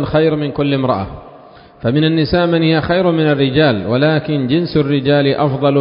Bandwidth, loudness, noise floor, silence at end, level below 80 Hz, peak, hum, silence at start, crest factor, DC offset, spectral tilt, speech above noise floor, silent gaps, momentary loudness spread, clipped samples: 5.4 kHz; -14 LUFS; -40 dBFS; 0 s; -40 dBFS; 0 dBFS; none; 0 s; 14 dB; under 0.1%; -12 dB/octave; 26 dB; none; 5 LU; under 0.1%